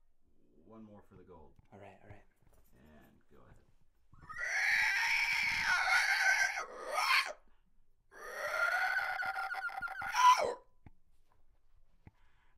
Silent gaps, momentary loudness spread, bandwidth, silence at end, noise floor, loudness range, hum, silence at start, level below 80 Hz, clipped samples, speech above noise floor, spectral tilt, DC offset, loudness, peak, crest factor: none; 13 LU; 16 kHz; 1.7 s; -65 dBFS; 5 LU; none; 0.7 s; -66 dBFS; under 0.1%; 8 dB; 0 dB/octave; under 0.1%; -32 LUFS; -14 dBFS; 22 dB